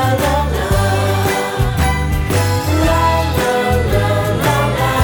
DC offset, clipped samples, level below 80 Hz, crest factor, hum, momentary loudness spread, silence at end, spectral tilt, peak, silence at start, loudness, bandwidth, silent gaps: under 0.1%; under 0.1%; -24 dBFS; 14 dB; none; 3 LU; 0 s; -5.5 dB/octave; 0 dBFS; 0 s; -15 LUFS; over 20 kHz; none